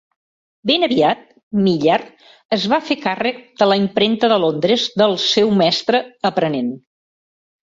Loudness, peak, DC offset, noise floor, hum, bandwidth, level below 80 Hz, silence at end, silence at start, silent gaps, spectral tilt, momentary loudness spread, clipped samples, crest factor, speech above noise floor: -17 LUFS; -2 dBFS; under 0.1%; under -90 dBFS; none; 7.8 kHz; -60 dBFS; 1 s; 0.65 s; 1.43-1.51 s, 2.45-2.49 s; -5 dB/octave; 8 LU; under 0.1%; 16 dB; over 73 dB